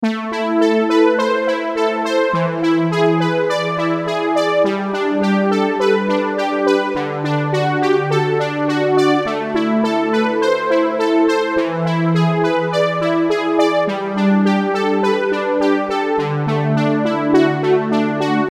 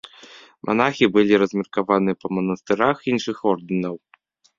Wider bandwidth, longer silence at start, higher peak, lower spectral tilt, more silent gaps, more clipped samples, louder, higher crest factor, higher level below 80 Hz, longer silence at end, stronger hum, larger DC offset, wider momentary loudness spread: first, 12 kHz vs 7.4 kHz; second, 0 s vs 0.35 s; about the same, -2 dBFS vs -2 dBFS; about the same, -6.5 dB/octave vs -6 dB/octave; neither; neither; first, -17 LUFS vs -21 LUFS; second, 14 dB vs 20 dB; about the same, -58 dBFS vs -60 dBFS; second, 0 s vs 0.6 s; neither; neither; second, 4 LU vs 10 LU